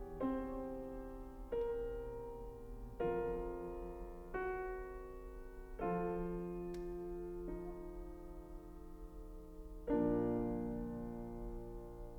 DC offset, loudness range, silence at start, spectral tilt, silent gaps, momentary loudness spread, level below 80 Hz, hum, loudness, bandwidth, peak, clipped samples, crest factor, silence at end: under 0.1%; 5 LU; 0 s; -9 dB/octave; none; 15 LU; -52 dBFS; none; -44 LUFS; over 20 kHz; -26 dBFS; under 0.1%; 18 dB; 0 s